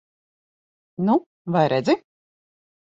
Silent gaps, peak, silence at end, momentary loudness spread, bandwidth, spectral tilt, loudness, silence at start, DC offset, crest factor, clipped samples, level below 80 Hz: 1.26-1.45 s; -6 dBFS; 0.9 s; 6 LU; 8 kHz; -7.5 dB/octave; -22 LUFS; 1 s; under 0.1%; 20 dB; under 0.1%; -66 dBFS